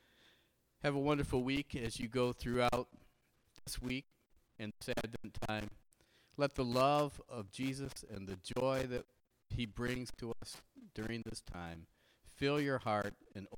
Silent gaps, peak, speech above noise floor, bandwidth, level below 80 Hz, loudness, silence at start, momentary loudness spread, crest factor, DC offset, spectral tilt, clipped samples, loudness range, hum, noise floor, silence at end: none; -18 dBFS; 35 dB; 19 kHz; -56 dBFS; -39 LUFS; 0.8 s; 14 LU; 20 dB; under 0.1%; -5.5 dB/octave; under 0.1%; 7 LU; none; -74 dBFS; 0 s